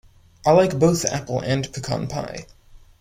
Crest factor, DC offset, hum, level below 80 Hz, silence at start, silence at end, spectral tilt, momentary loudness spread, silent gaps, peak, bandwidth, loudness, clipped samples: 18 dB; under 0.1%; none; -48 dBFS; 0.45 s; 0.2 s; -5.5 dB/octave; 13 LU; none; -4 dBFS; 16 kHz; -21 LUFS; under 0.1%